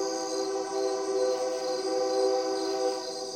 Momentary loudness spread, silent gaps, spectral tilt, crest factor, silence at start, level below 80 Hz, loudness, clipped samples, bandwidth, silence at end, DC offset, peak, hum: 4 LU; none; -2 dB/octave; 14 dB; 0 s; -84 dBFS; -29 LUFS; under 0.1%; 15.5 kHz; 0 s; under 0.1%; -16 dBFS; none